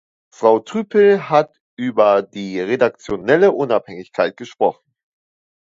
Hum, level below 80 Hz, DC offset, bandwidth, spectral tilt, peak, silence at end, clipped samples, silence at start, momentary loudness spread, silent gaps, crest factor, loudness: none; -58 dBFS; under 0.1%; 7.6 kHz; -6.5 dB/octave; 0 dBFS; 1.05 s; under 0.1%; 0.4 s; 11 LU; 1.60-1.77 s; 18 dB; -17 LUFS